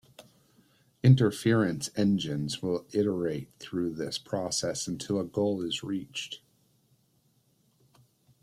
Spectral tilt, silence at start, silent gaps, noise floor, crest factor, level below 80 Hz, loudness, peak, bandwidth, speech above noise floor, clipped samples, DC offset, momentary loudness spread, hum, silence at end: -5.5 dB/octave; 0.2 s; none; -69 dBFS; 22 dB; -64 dBFS; -29 LUFS; -8 dBFS; 14 kHz; 41 dB; under 0.1%; under 0.1%; 13 LU; none; 2.05 s